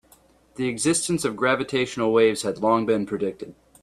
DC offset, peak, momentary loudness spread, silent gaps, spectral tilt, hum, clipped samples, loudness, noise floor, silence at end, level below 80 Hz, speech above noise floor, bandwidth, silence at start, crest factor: under 0.1%; -6 dBFS; 10 LU; none; -4 dB/octave; none; under 0.1%; -23 LUFS; -57 dBFS; 0.3 s; -60 dBFS; 34 dB; 14 kHz; 0.6 s; 18 dB